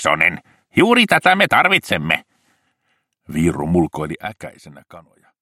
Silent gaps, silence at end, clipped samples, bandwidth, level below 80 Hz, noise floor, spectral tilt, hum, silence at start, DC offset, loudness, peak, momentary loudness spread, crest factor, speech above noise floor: none; 0.4 s; under 0.1%; 16 kHz; -46 dBFS; -69 dBFS; -4.5 dB/octave; none; 0 s; under 0.1%; -16 LUFS; 0 dBFS; 17 LU; 18 dB; 51 dB